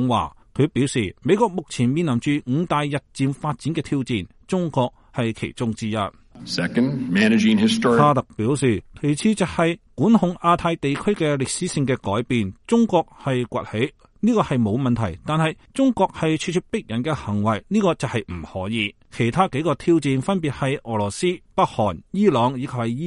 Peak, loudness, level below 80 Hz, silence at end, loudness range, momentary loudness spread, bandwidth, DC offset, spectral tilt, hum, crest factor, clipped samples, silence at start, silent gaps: -2 dBFS; -22 LUFS; -50 dBFS; 0 s; 5 LU; 8 LU; 11.5 kHz; under 0.1%; -6 dB/octave; none; 18 dB; under 0.1%; 0 s; none